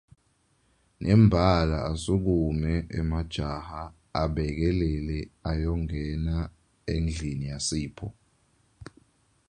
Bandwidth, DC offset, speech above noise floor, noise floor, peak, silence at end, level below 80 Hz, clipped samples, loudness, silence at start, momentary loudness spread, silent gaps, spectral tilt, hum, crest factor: 11 kHz; under 0.1%; 42 dB; -68 dBFS; -6 dBFS; 0.65 s; -36 dBFS; under 0.1%; -27 LUFS; 1 s; 14 LU; none; -6.5 dB/octave; none; 20 dB